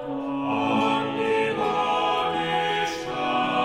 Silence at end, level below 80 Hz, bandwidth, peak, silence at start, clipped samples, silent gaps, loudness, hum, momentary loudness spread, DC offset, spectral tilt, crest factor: 0 s; -58 dBFS; 15.5 kHz; -10 dBFS; 0 s; under 0.1%; none; -24 LUFS; none; 5 LU; under 0.1%; -4.5 dB/octave; 14 dB